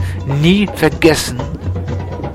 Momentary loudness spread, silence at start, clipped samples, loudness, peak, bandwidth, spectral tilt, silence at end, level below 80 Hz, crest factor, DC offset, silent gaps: 10 LU; 0 s; under 0.1%; -15 LUFS; 0 dBFS; 15.5 kHz; -5.5 dB/octave; 0 s; -30 dBFS; 14 dB; 0.3%; none